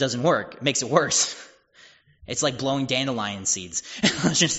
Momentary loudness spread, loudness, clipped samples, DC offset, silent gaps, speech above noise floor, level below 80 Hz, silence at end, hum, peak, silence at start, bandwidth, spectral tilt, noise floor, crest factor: 6 LU; -23 LUFS; under 0.1%; under 0.1%; none; 30 dB; -58 dBFS; 0 s; none; -2 dBFS; 0 s; 8.2 kHz; -3 dB/octave; -54 dBFS; 22 dB